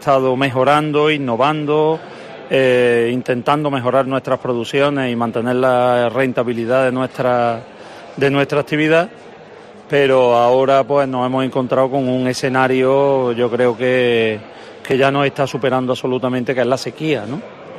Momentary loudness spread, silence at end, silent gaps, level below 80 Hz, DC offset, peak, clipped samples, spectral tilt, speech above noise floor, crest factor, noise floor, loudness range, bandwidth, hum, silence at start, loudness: 7 LU; 0 s; none; -58 dBFS; under 0.1%; -2 dBFS; under 0.1%; -6 dB/octave; 23 dB; 14 dB; -38 dBFS; 2 LU; 13 kHz; none; 0 s; -16 LUFS